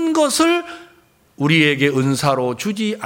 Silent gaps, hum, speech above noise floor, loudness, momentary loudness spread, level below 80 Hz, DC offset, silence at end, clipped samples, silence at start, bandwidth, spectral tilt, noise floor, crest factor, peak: none; none; 36 dB; -17 LUFS; 8 LU; -58 dBFS; under 0.1%; 0 s; under 0.1%; 0 s; 17 kHz; -4.5 dB/octave; -53 dBFS; 16 dB; -2 dBFS